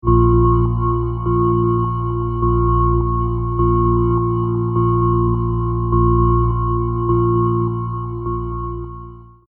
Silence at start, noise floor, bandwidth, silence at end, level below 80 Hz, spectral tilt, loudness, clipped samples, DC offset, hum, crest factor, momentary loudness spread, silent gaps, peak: 0.05 s; -36 dBFS; 3.1 kHz; 0.25 s; -24 dBFS; -14.5 dB/octave; -18 LUFS; under 0.1%; under 0.1%; none; 16 dB; 9 LU; none; -2 dBFS